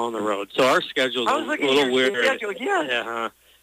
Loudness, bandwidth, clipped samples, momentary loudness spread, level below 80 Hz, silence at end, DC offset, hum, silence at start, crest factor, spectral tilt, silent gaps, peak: -22 LUFS; 15.5 kHz; under 0.1%; 7 LU; -66 dBFS; 0.35 s; under 0.1%; none; 0 s; 14 dB; -3 dB/octave; none; -8 dBFS